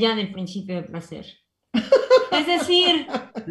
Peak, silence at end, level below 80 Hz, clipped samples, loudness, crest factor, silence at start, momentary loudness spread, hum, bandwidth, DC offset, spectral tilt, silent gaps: -4 dBFS; 0 s; -64 dBFS; under 0.1%; -20 LUFS; 18 dB; 0 s; 18 LU; none; 12.5 kHz; under 0.1%; -4.5 dB/octave; none